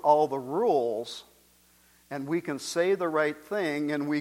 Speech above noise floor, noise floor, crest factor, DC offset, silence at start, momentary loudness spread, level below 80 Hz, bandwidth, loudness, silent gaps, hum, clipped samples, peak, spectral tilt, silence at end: 34 dB; -61 dBFS; 20 dB; under 0.1%; 0.05 s; 12 LU; -72 dBFS; 16.5 kHz; -28 LUFS; none; 60 Hz at -65 dBFS; under 0.1%; -8 dBFS; -5 dB/octave; 0 s